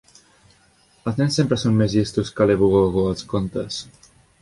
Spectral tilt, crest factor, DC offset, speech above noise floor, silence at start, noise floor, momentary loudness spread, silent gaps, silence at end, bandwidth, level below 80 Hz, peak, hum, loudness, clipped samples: -6.5 dB/octave; 18 dB; under 0.1%; 38 dB; 1.05 s; -57 dBFS; 11 LU; none; 0.6 s; 11.5 kHz; -44 dBFS; -4 dBFS; none; -20 LUFS; under 0.1%